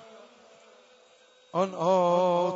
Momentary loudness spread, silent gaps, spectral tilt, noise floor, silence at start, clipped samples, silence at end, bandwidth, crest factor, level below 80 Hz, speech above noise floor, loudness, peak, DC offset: 8 LU; none; -6.5 dB/octave; -59 dBFS; 0.15 s; under 0.1%; 0 s; 7.8 kHz; 16 dB; -86 dBFS; 34 dB; -25 LUFS; -12 dBFS; under 0.1%